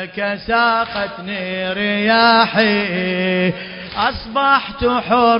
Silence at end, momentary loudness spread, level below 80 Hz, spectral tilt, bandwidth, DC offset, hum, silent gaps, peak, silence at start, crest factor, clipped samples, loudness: 0 s; 11 LU; -42 dBFS; -8 dB/octave; 5.4 kHz; under 0.1%; none; none; 0 dBFS; 0 s; 16 dB; under 0.1%; -16 LUFS